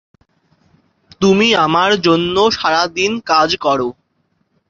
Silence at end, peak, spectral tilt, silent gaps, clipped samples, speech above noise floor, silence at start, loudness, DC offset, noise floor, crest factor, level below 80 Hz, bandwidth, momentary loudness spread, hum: 0.8 s; 0 dBFS; -4.5 dB/octave; none; under 0.1%; 50 dB; 1.2 s; -14 LUFS; under 0.1%; -64 dBFS; 16 dB; -50 dBFS; 7.6 kHz; 6 LU; none